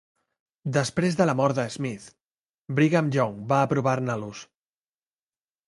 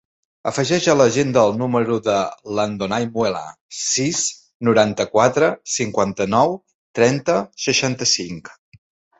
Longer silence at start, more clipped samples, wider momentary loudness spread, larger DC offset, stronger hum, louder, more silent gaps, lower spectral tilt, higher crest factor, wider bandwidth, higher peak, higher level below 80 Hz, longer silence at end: first, 0.65 s vs 0.45 s; neither; first, 13 LU vs 9 LU; neither; neither; second, -25 LUFS vs -19 LUFS; about the same, 2.33-2.65 s vs 3.61-3.69 s, 4.54-4.60 s, 6.75-6.94 s; first, -6.5 dB/octave vs -4 dB/octave; about the same, 20 dB vs 18 dB; first, 11.5 kHz vs 8.4 kHz; second, -6 dBFS vs -2 dBFS; second, -62 dBFS vs -56 dBFS; first, 1.25 s vs 0.7 s